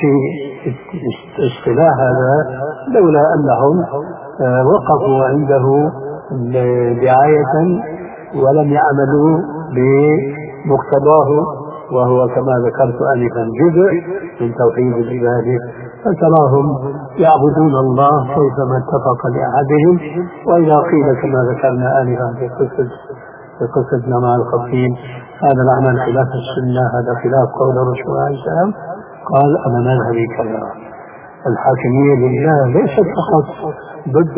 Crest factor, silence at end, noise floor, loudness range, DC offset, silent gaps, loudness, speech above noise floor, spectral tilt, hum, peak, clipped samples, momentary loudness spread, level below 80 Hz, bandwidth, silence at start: 14 dB; 0 s; -34 dBFS; 3 LU; under 0.1%; none; -14 LUFS; 21 dB; -12.5 dB/octave; none; 0 dBFS; under 0.1%; 13 LU; -48 dBFS; 3.7 kHz; 0 s